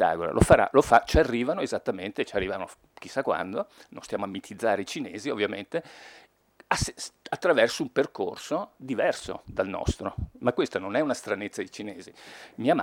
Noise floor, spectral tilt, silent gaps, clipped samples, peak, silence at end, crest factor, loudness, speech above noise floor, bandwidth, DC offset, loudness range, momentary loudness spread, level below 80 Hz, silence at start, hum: -59 dBFS; -5 dB/octave; none; under 0.1%; -4 dBFS; 0 s; 24 dB; -27 LUFS; 31 dB; 17.5 kHz; under 0.1%; 7 LU; 19 LU; -42 dBFS; 0 s; none